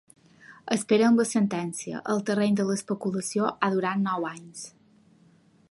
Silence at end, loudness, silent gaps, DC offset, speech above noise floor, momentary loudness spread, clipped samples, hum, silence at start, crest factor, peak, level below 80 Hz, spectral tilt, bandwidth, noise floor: 1.05 s; -26 LUFS; none; under 0.1%; 34 dB; 17 LU; under 0.1%; none; 0.45 s; 20 dB; -8 dBFS; -70 dBFS; -5 dB/octave; 11.5 kHz; -59 dBFS